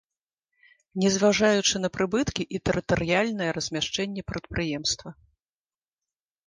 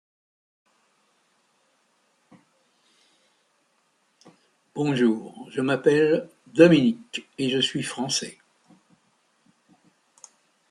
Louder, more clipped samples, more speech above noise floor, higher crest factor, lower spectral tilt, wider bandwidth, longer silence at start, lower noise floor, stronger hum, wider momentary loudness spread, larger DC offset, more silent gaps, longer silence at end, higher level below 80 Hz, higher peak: about the same, -25 LUFS vs -23 LUFS; neither; first, over 64 dB vs 46 dB; second, 18 dB vs 24 dB; about the same, -4 dB/octave vs -5 dB/octave; second, 10.5 kHz vs 12 kHz; second, 0.95 s vs 4.75 s; first, under -90 dBFS vs -68 dBFS; neither; second, 11 LU vs 17 LU; neither; neither; second, 1.35 s vs 2.4 s; first, -50 dBFS vs -72 dBFS; second, -10 dBFS vs -2 dBFS